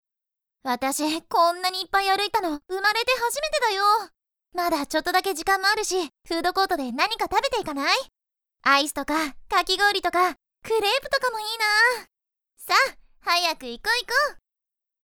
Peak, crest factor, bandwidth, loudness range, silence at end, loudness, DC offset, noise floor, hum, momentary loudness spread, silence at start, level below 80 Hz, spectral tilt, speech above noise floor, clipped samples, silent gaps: -6 dBFS; 18 dB; over 20 kHz; 2 LU; 0.65 s; -23 LUFS; under 0.1%; -88 dBFS; none; 8 LU; 0.65 s; -54 dBFS; -1 dB/octave; 64 dB; under 0.1%; none